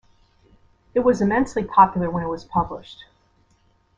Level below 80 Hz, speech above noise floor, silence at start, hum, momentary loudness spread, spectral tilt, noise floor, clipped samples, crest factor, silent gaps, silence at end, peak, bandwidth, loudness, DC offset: -48 dBFS; 41 dB; 0.95 s; none; 13 LU; -7 dB/octave; -61 dBFS; under 0.1%; 20 dB; none; 1.05 s; -2 dBFS; 9.8 kHz; -21 LUFS; under 0.1%